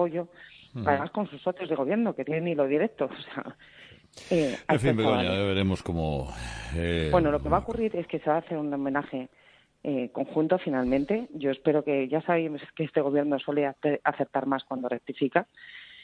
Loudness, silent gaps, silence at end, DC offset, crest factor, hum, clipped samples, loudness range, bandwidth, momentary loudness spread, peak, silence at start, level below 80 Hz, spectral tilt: -28 LUFS; none; 0 s; under 0.1%; 20 dB; none; under 0.1%; 3 LU; 10.5 kHz; 12 LU; -8 dBFS; 0 s; -48 dBFS; -7 dB/octave